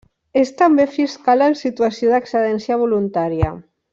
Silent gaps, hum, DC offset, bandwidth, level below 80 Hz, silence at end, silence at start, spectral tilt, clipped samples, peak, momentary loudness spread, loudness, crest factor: none; none; under 0.1%; 7.6 kHz; -42 dBFS; 0.3 s; 0.35 s; -7 dB/octave; under 0.1%; -2 dBFS; 6 LU; -17 LUFS; 14 dB